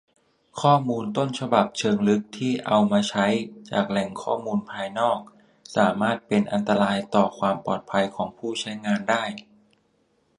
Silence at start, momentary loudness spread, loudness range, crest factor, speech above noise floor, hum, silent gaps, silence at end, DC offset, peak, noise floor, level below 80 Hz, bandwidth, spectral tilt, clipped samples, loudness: 0.55 s; 8 LU; 3 LU; 22 dB; 43 dB; none; none; 0.95 s; under 0.1%; -2 dBFS; -67 dBFS; -64 dBFS; 11 kHz; -5.5 dB/octave; under 0.1%; -24 LUFS